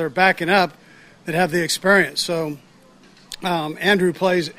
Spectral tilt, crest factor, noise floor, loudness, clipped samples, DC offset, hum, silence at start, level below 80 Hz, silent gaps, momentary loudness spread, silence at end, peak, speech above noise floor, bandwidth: -4 dB/octave; 20 dB; -50 dBFS; -19 LUFS; under 0.1%; under 0.1%; none; 0 s; -58 dBFS; none; 13 LU; 0.05 s; 0 dBFS; 31 dB; 16 kHz